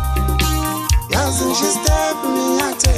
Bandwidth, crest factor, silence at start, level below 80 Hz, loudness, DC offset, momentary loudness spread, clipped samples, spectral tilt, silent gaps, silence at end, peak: 15.5 kHz; 16 dB; 0 s; -22 dBFS; -17 LUFS; under 0.1%; 3 LU; under 0.1%; -4 dB/octave; none; 0 s; 0 dBFS